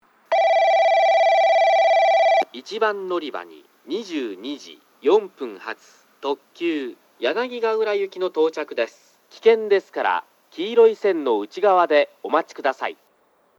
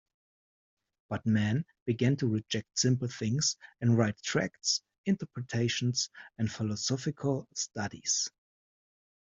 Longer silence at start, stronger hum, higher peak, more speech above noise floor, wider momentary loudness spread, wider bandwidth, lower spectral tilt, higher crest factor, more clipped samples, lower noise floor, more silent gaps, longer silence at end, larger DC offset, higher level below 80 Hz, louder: second, 0.3 s vs 1.1 s; neither; first, -4 dBFS vs -12 dBFS; second, 39 dB vs over 59 dB; first, 15 LU vs 7 LU; first, 12 kHz vs 8 kHz; about the same, -3.5 dB/octave vs -4.5 dB/octave; about the same, 18 dB vs 20 dB; neither; second, -61 dBFS vs under -90 dBFS; second, none vs 1.82-1.86 s, 4.98-5.04 s; second, 0.65 s vs 1.1 s; neither; second, -84 dBFS vs -68 dBFS; first, -20 LUFS vs -31 LUFS